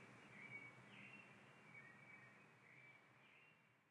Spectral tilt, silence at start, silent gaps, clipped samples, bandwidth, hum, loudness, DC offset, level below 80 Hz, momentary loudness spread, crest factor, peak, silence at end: -4.5 dB/octave; 0 s; none; under 0.1%; 10.5 kHz; none; -62 LUFS; under 0.1%; under -90 dBFS; 11 LU; 18 dB; -46 dBFS; 0 s